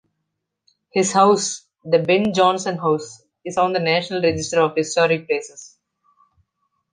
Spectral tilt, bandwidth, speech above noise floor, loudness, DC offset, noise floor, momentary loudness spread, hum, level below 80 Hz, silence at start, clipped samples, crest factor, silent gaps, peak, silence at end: -4 dB/octave; 10 kHz; 59 dB; -19 LUFS; under 0.1%; -78 dBFS; 10 LU; none; -56 dBFS; 0.95 s; under 0.1%; 18 dB; none; -2 dBFS; 1.25 s